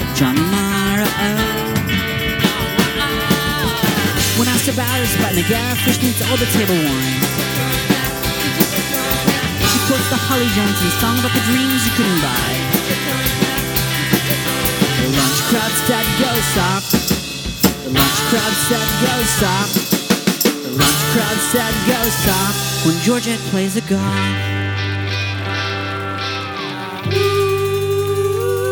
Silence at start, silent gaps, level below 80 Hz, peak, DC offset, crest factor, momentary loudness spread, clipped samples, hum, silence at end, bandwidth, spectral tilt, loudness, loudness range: 0 s; none; -36 dBFS; 0 dBFS; under 0.1%; 16 dB; 4 LU; under 0.1%; none; 0 s; 19.5 kHz; -3.5 dB/octave; -16 LUFS; 4 LU